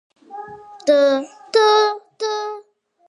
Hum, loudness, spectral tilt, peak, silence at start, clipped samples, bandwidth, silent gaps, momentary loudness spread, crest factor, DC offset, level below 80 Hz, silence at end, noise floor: none; -18 LUFS; -2 dB/octave; -2 dBFS; 0.3 s; under 0.1%; 11 kHz; none; 22 LU; 16 dB; under 0.1%; -74 dBFS; 0.5 s; -49 dBFS